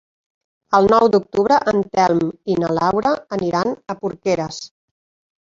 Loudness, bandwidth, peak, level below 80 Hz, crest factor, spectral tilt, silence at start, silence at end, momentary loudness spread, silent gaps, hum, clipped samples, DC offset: -18 LUFS; 7.6 kHz; -2 dBFS; -52 dBFS; 18 dB; -6 dB/octave; 0.7 s; 0.75 s; 11 LU; none; none; under 0.1%; under 0.1%